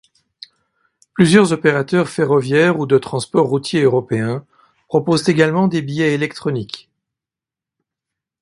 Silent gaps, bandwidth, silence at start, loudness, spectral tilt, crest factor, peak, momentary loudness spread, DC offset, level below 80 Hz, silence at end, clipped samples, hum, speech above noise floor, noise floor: none; 11.5 kHz; 1.15 s; -16 LUFS; -6 dB/octave; 18 dB; 0 dBFS; 11 LU; under 0.1%; -56 dBFS; 1.6 s; under 0.1%; none; 72 dB; -88 dBFS